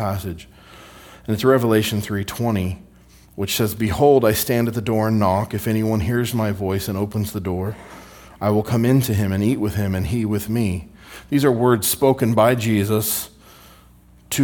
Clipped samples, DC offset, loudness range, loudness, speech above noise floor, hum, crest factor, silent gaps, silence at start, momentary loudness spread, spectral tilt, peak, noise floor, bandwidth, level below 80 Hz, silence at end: under 0.1%; under 0.1%; 3 LU; -20 LUFS; 30 dB; none; 18 dB; none; 0 s; 13 LU; -5.5 dB/octave; -2 dBFS; -49 dBFS; 18 kHz; -46 dBFS; 0 s